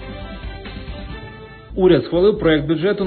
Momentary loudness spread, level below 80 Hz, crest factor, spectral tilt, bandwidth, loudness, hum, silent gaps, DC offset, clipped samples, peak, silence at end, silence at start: 19 LU; -36 dBFS; 16 dB; -12 dB/octave; 4.5 kHz; -16 LUFS; none; none; under 0.1%; under 0.1%; -2 dBFS; 0 s; 0 s